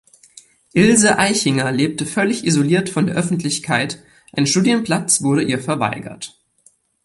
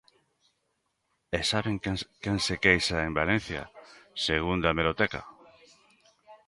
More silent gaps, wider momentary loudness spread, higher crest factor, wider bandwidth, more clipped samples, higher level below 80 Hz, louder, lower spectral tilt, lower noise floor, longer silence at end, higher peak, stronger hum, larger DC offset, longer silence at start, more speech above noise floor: neither; about the same, 13 LU vs 15 LU; second, 18 dB vs 24 dB; about the same, 11.5 kHz vs 11.5 kHz; neither; second, -54 dBFS vs -48 dBFS; first, -17 LUFS vs -28 LUFS; about the same, -4 dB/octave vs -4.5 dB/octave; second, -56 dBFS vs -77 dBFS; first, 0.75 s vs 0.1 s; first, 0 dBFS vs -6 dBFS; neither; neither; second, 0.75 s vs 1.3 s; second, 39 dB vs 49 dB